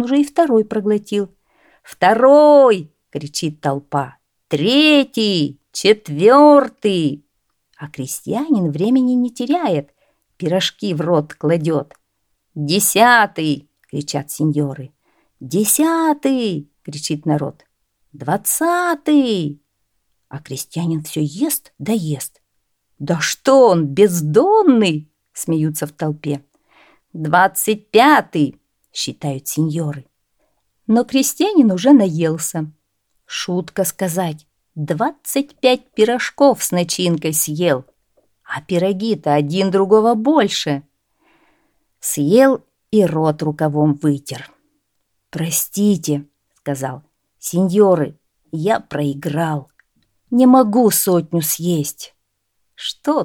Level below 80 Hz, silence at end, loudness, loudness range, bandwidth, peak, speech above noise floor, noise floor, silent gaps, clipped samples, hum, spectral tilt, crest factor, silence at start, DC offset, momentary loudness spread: -64 dBFS; 0 s; -16 LUFS; 6 LU; 19 kHz; 0 dBFS; 55 dB; -71 dBFS; none; under 0.1%; none; -4.5 dB/octave; 16 dB; 0 s; under 0.1%; 16 LU